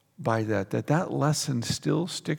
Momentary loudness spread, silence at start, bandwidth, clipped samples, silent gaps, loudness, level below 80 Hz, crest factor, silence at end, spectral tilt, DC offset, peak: 3 LU; 0.2 s; 18 kHz; under 0.1%; none; -27 LUFS; -62 dBFS; 18 dB; 0 s; -5 dB/octave; under 0.1%; -10 dBFS